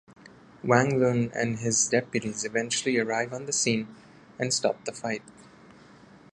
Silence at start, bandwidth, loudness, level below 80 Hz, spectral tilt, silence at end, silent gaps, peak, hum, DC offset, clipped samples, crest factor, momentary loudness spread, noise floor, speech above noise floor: 0.65 s; 11.5 kHz; -27 LUFS; -64 dBFS; -3.5 dB/octave; 0.9 s; none; -4 dBFS; none; under 0.1%; under 0.1%; 24 dB; 10 LU; -52 dBFS; 26 dB